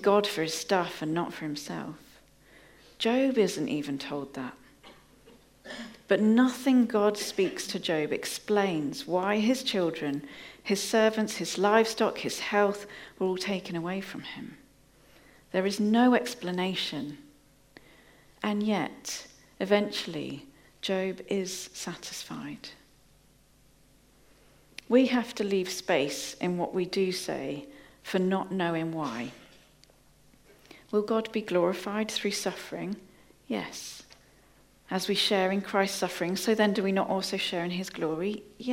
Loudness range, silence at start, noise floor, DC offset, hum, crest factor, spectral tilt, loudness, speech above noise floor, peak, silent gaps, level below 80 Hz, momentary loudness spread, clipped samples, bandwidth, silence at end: 6 LU; 0 s; -61 dBFS; under 0.1%; none; 22 dB; -4.5 dB/octave; -29 LUFS; 33 dB; -8 dBFS; none; -66 dBFS; 15 LU; under 0.1%; 16.5 kHz; 0 s